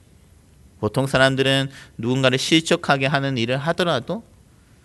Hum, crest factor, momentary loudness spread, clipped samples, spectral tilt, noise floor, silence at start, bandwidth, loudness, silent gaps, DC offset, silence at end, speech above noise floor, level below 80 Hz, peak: none; 22 dB; 12 LU; under 0.1%; -5 dB/octave; -52 dBFS; 0.8 s; 12 kHz; -20 LUFS; none; under 0.1%; 0.65 s; 32 dB; -52 dBFS; 0 dBFS